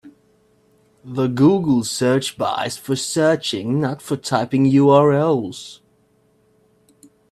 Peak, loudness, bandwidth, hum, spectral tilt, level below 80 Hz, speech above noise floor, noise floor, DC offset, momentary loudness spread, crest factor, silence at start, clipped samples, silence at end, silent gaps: 0 dBFS; -18 LUFS; 14 kHz; none; -5.5 dB/octave; -60 dBFS; 42 dB; -59 dBFS; under 0.1%; 11 LU; 18 dB; 0.05 s; under 0.1%; 1.55 s; none